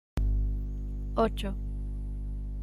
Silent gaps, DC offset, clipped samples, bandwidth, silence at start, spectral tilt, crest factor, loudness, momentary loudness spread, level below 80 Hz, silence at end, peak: none; under 0.1%; under 0.1%; 11 kHz; 0.15 s; -7.5 dB/octave; 16 dB; -34 LUFS; 9 LU; -32 dBFS; 0 s; -14 dBFS